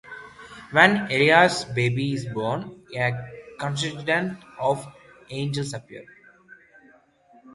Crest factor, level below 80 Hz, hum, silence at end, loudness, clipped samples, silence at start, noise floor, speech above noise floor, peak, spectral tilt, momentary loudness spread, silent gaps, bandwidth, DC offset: 24 dB; -60 dBFS; none; 1.5 s; -23 LUFS; under 0.1%; 0.05 s; -56 dBFS; 33 dB; 0 dBFS; -5 dB/octave; 24 LU; none; 11.5 kHz; under 0.1%